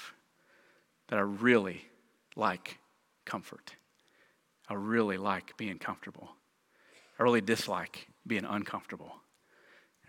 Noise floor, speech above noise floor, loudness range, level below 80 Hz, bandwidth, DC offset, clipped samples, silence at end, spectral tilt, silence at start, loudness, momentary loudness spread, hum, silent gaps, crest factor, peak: -69 dBFS; 36 dB; 4 LU; -80 dBFS; 17 kHz; under 0.1%; under 0.1%; 0.9 s; -5 dB/octave; 0 s; -33 LUFS; 23 LU; none; none; 24 dB; -10 dBFS